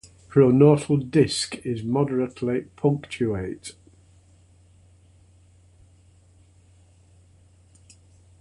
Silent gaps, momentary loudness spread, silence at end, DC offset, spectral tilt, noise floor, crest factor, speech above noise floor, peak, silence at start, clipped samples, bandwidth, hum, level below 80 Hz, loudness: none; 13 LU; 4.7 s; under 0.1%; -6.5 dB/octave; -55 dBFS; 22 dB; 34 dB; -4 dBFS; 0.35 s; under 0.1%; 11.5 kHz; none; -54 dBFS; -22 LUFS